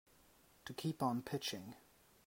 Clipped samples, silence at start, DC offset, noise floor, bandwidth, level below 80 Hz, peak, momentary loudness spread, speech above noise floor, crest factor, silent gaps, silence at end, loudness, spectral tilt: under 0.1%; 0.65 s; under 0.1%; -69 dBFS; 16 kHz; -76 dBFS; -24 dBFS; 17 LU; 27 dB; 20 dB; none; 0.45 s; -42 LUFS; -5 dB/octave